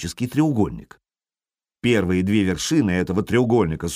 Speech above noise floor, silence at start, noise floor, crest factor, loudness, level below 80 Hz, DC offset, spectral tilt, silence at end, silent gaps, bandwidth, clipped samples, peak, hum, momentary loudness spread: over 70 dB; 0 s; under -90 dBFS; 14 dB; -21 LUFS; -44 dBFS; under 0.1%; -6 dB/octave; 0 s; none; 15.5 kHz; under 0.1%; -8 dBFS; none; 6 LU